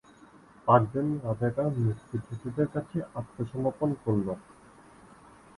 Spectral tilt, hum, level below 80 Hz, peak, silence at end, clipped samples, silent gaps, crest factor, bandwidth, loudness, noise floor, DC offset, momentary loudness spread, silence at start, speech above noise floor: -9.5 dB/octave; none; -58 dBFS; -6 dBFS; 1.15 s; under 0.1%; none; 24 dB; 11.5 kHz; -30 LUFS; -55 dBFS; under 0.1%; 13 LU; 0.65 s; 26 dB